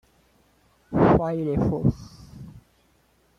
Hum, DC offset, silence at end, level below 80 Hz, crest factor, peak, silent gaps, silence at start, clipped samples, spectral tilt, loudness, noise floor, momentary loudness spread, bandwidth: none; under 0.1%; 0.8 s; -44 dBFS; 20 dB; -6 dBFS; none; 0.9 s; under 0.1%; -9.5 dB/octave; -23 LUFS; -63 dBFS; 25 LU; 10 kHz